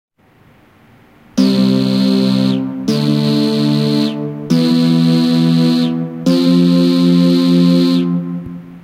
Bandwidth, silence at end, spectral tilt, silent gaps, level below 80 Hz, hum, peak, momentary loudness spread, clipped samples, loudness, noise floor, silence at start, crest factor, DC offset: 15 kHz; 0.05 s; -7 dB/octave; none; -56 dBFS; none; 0 dBFS; 7 LU; under 0.1%; -13 LUFS; -49 dBFS; 1.35 s; 12 dB; under 0.1%